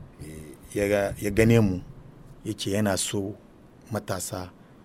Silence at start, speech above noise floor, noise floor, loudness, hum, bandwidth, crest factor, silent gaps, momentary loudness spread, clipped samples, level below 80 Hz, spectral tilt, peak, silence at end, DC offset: 0 s; 22 dB; -47 dBFS; -26 LUFS; none; 16 kHz; 20 dB; none; 22 LU; under 0.1%; -46 dBFS; -5.5 dB/octave; -6 dBFS; 0.35 s; under 0.1%